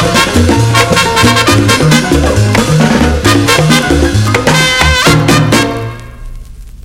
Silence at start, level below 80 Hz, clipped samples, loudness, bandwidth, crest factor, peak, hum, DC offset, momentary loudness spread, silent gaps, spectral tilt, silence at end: 0 s; -22 dBFS; 0.4%; -8 LUFS; 17 kHz; 8 dB; 0 dBFS; none; under 0.1%; 3 LU; none; -4.5 dB/octave; 0.05 s